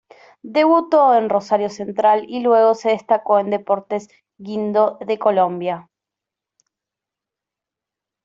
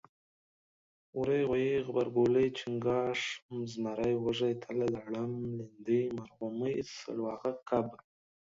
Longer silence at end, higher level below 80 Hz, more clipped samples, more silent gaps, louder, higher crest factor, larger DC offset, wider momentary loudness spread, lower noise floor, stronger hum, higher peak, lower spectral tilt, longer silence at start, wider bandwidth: first, 2.45 s vs 0.5 s; about the same, -70 dBFS vs -66 dBFS; neither; second, none vs 3.42-3.49 s; first, -18 LUFS vs -34 LUFS; about the same, 16 dB vs 18 dB; neither; about the same, 12 LU vs 10 LU; second, -86 dBFS vs under -90 dBFS; neither; first, -4 dBFS vs -16 dBFS; about the same, -6 dB/octave vs -6.5 dB/octave; second, 0.45 s vs 1.15 s; about the same, 7.6 kHz vs 7.8 kHz